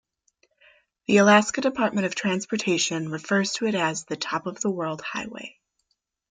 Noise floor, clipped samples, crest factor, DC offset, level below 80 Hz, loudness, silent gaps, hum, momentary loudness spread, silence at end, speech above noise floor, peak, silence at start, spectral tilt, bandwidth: -76 dBFS; under 0.1%; 20 dB; under 0.1%; -68 dBFS; -24 LUFS; none; none; 14 LU; 0.8 s; 52 dB; -4 dBFS; 1.1 s; -4 dB/octave; 9.6 kHz